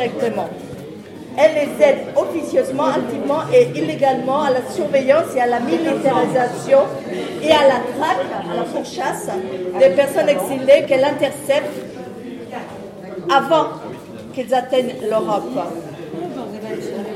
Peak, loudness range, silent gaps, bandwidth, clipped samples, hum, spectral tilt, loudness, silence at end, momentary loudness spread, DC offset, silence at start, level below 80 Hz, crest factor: -2 dBFS; 4 LU; none; 15 kHz; under 0.1%; none; -5 dB/octave; -18 LUFS; 0 s; 16 LU; under 0.1%; 0 s; -60 dBFS; 16 dB